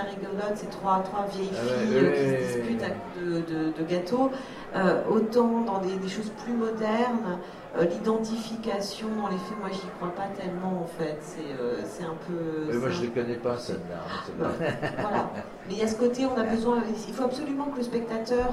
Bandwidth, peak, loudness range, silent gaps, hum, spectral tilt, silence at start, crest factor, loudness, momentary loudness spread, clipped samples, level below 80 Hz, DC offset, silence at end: 13.5 kHz; -10 dBFS; 5 LU; none; none; -6 dB/octave; 0 s; 18 dB; -29 LUFS; 9 LU; under 0.1%; -56 dBFS; under 0.1%; 0 s